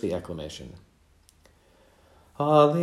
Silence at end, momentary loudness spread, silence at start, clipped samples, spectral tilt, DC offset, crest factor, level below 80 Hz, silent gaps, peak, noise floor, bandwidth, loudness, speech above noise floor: 0 s; 22 LU; 0.05 s; under 0.1%; -7 dB/octave; under 0.1%; 22 dB; -58 dBFS; none; -6 dBFS; -60 dBFS; 13 kHz; -25 LUFS; 36 dB